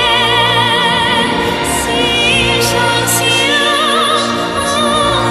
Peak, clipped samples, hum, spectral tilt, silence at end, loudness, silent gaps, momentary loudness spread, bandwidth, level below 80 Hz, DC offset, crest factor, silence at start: 0 dBFS; under 0.1%; none; -2.5 dB/octave; 0 s; -11 LUFS; none; 4 LU; 13 kHz; -34 dBFS; under 0.1%; 12 dB; 0 s